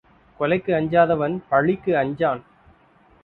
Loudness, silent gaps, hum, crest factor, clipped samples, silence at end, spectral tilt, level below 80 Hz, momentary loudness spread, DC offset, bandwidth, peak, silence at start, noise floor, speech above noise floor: -21 LUFS; none; none; 18 dB; under 0.1%; 0.85 s; -10 dB/octave; -56 dBFS; 6 LU; under 0.1%; 4.3 kHz; -4 dBFS; 0.4 s; -55 dBFS; 35 dB